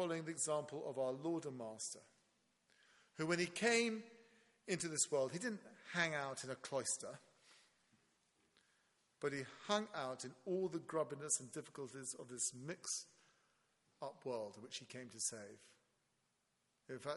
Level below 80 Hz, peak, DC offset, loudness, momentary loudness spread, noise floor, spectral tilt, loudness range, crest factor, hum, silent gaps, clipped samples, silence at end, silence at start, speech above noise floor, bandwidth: -88 dBFS; -20 dBFS; under 0.1%; -43 LUFS; 15 LU; -84 dBFS; -3 dB/octave; 8 LU; 24 dB; none; none; under 0.1%; 0 s; 0 s; 40 dB; 11.5 kHz